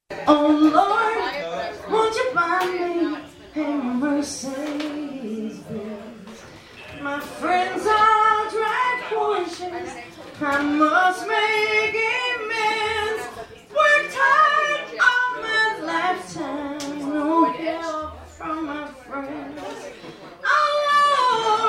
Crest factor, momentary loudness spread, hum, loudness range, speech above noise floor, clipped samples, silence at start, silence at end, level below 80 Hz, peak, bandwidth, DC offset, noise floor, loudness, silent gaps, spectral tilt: 20 dB; 17 LU; none; 8 LU; 21 dB; under 0.1%; 0.1 s; 0 s; -56 dBFS; -2 dBFS; 16 kHz; under 0.1%; -42 dBFS; -21 LUFS; none; -3.5 dB/octave